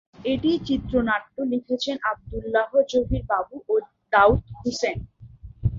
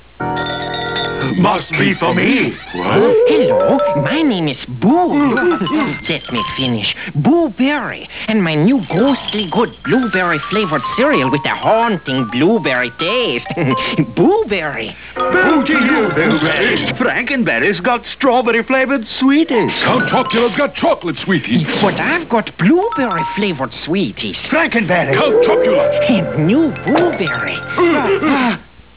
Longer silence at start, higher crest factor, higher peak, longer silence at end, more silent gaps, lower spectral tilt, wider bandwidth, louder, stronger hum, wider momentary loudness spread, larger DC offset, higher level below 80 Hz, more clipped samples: about the same, 0.2 s vs 0.2 s; first, 20 dB vs 14 dB; second, -4 dBFS vs 0 dBFS; second, 0 s vs 0.35 s; neither; second, -6 dB/octave vs -9.5 dB/octave; first, 7.8 kHz vs 4 kHz; second, -24 LUFS vs -14 LUFS; neither; first, 9 LU vs 6 LU; second, under 0.1% vs 0.4%; first, -40 dBFS vs -46 dBFS; neither